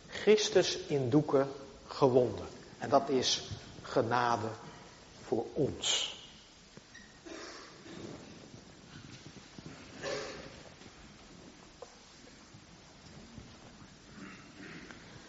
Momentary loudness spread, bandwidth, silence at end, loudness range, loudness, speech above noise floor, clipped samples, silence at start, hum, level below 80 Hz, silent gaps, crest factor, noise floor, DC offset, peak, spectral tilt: 25 LU; 8 kHz; 0 s; 21 LU; -32 LUFS; 26 dB; under 0.1%; 0.05 s; none; -64 dBFS; none; 24 dB; -56 dBFS; under 0.1%; -12 dBFS; -3.5 dB/octave